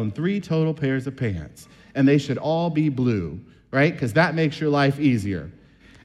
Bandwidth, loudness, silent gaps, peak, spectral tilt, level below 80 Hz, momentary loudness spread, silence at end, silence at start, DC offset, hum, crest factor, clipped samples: 12.5 kHz; -22 LUFS; none; -6 dBFS; -7.5 dB/octave; -52 dBFS; 13 LU; 0.5 s; 0 s; under 0.1%; none; 16 dB; under 0.1%